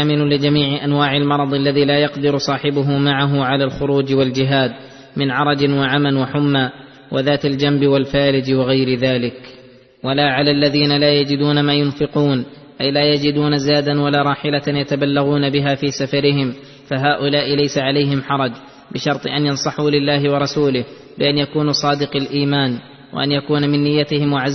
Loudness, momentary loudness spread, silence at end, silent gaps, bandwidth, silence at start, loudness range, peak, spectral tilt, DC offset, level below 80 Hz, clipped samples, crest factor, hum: -17 LUFS; 7 LU; 0 s; none; 6.4 kHz; 0 s; 2 LU; -2 dBFS; -6 dB/octave; under 0.1%; -50 dBFS; under 0.1%; 14 dB; none